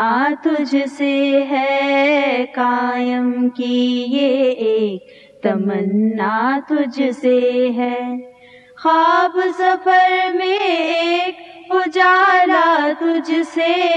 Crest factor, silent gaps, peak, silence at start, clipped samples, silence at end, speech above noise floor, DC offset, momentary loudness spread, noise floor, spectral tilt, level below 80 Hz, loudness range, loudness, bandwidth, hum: 14 dB; none; -2 dBFS; 0 s; under 0.1%; 0 s; 28 dB; under 0.1%; 7 LU; -44 dBFS; -5.5 dB/octave; -72 dBFS; 3 LU; -16 LUFS; 9.2 kHz; none